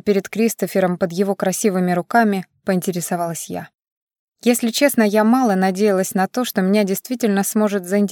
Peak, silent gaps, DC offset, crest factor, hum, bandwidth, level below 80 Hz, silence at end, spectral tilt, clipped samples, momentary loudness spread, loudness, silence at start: -2 dBFS; 3.92-4.07 s, 4.19-4.32 s; under 0.1%; 16 dB; none; 17.5 kHz; -66 dBFS; 0 s; -5 dB/octave; under 0.1%; 7 LU; -18 LUFS; 0.05 s